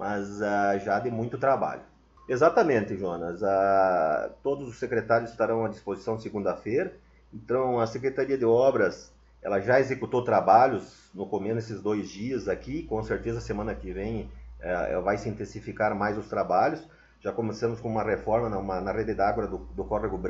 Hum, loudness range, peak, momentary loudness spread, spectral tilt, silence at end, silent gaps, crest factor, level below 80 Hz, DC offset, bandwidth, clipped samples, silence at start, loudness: none; 7 LU; -6 dBFS; 12 LU; -7 dB/octave; 0 s; none; 20 dB; -50 dBFS; under 0.1%; 7.8 kHz; under 0.1%; 0 s; -27 LUFS